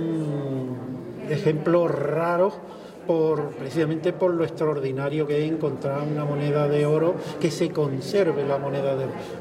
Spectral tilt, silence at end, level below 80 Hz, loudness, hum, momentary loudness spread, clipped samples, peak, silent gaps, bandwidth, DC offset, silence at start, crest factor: -7.5 dB/octave; 0 s; -64 dBFS; -24 LUFS; none; 8 LU; under 0.1%; -8 dBFS; none; 13.5 kHz; under 0.1%; 0 s; 16 dB